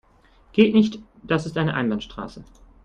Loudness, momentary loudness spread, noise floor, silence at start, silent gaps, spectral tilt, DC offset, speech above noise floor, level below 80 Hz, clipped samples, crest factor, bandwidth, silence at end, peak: -22 LUFS; 19 LU; -55 dBFS; 0.55 s; none; -7 dB/octave; under 0.1%; 34 dB; -50 dBFS; under 0.1%; 20 dB; 8.8 kHz; 0.4 s; -4 dBFS